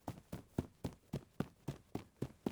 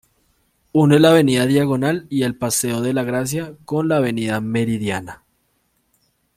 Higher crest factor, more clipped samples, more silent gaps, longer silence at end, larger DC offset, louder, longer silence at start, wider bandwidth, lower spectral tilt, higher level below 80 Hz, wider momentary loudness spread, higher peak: first, 24 dB vs 16 dB; neither; neither; second, 0 s vs 1.2 s; neither; second, -48 LUFS vs -18 LUFS; second, 0.05 s vs 0.75 s; first, over 20 kHz vs 16 kHz; first, -7 dB/octave vs -5.5 dB/octave; second, -62 dBFS vs -56 dBFS; second, 6 LU vs 12 LU; second, -22 dBFS vs -2 dBFS